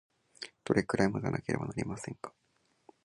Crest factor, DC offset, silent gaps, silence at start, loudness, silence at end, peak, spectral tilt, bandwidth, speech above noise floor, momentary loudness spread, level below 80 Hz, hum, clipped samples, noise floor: 24 dB; under 0.1%; none; 0.4 s; -33 LUFS; 0.75 s; -12 dBFS; -6 dB/octave; 11.5 kHz; 31 dB; 16 LU; -60 dBFS; none; under 0.1%; -64 dBFS